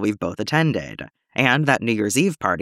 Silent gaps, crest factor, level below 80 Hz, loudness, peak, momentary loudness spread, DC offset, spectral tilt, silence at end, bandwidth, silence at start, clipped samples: none; 18 dB; -56 dBFS; -20 LUFS; -2 dBFS; 11 LU; under 0.1%; -5 dB/octave; 0 s; 15.5 kHz; 0 s; under 0.1%